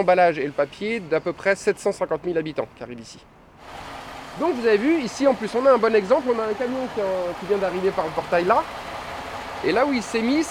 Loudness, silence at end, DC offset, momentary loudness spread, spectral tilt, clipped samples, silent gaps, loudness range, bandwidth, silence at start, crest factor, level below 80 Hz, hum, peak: -22 LUFS; 0 s; under 0.1%; 18 LU; -5 dB/octave; under 0.1%; none; 5 LU; 15 kHz; 0 s; 18 dB; -54 dBFS; none; -6 dBFS